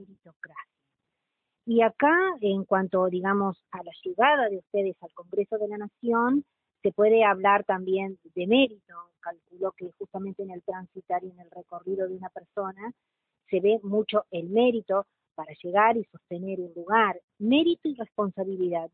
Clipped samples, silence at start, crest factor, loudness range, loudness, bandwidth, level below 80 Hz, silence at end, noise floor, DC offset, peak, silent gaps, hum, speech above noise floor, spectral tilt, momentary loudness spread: under 0.1%; 0 s; 20 dB; 10 LU; -26 LUFS; 4.3 kHz; -72 dBFS; 0.05 s; -83 dBFS; under 0.1%; -6 dBFS; 0.36-0.40 s, 17.24-17.28 s; none; 56 dB; -10 dB/octave; 19 LU